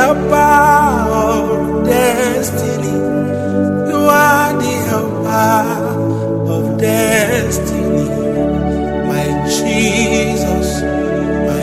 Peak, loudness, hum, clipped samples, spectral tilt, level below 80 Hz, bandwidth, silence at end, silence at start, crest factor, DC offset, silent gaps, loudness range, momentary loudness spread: 0 dBFS; -14 LUFS; none; under 0.1%; -5 dB/octave; -32 dBFS; 16.5 kHz; 0 s; 0 s; 14 dB; under 0.1%; none; 2 LU; 7 LU